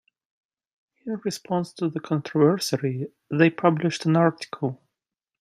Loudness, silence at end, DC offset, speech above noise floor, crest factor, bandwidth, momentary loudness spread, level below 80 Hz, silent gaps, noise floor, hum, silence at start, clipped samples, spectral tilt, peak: -24 LUFS; 0.65 s; under 0.1%; 63 dB; 20 dB; 15 kHz; 11 LU; -70 dBFS; none; -87 dBFS; none; 1.05 s; under 0.1%; -6 dB/octave; -4 dBFS